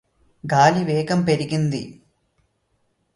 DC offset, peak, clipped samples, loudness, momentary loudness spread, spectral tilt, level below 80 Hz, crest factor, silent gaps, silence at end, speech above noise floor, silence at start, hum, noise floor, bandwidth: under 0.1%; -2 dBFS; under 0.1%; -20 LUFS; 16 LU; -6 dB/octave; -58 dBFS; 20 dB; none; 1.25 s; 49 dB; 0.45 s; none; -69 dBFS; 11.5 kHz